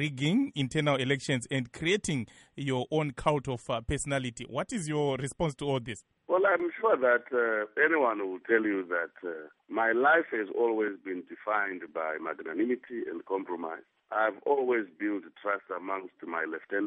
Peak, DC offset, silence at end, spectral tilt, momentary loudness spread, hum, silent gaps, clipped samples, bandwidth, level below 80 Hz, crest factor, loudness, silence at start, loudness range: -10 dBFS; under 0.1%; 0 s; -5 dB/octave; 11 LU; none; none; under 0.1%; 11 kHz; -56 dBFS; 20 dB; -30 LUFS; 0 s; 5 LU